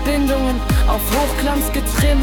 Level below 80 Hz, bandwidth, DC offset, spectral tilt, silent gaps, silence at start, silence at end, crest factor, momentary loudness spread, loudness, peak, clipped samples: -20 dBFS; 19 kHz; under 0.1%; -5 dB/octave; none; 0 s; 0 s; 12 dB; 2 LU; -18 LUFS; -4 dBFS; under 0.1%